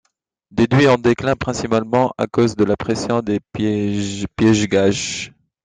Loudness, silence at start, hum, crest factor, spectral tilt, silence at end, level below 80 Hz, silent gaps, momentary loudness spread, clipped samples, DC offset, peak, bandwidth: -18 LUFS; 0.55 s; none; 16 dB; -5.5 dB/octave; 0.35 s; -46 dBFS; none; 9 LU; under 0.1%; under 0.1%; -2 dBFS; 9.6 kHz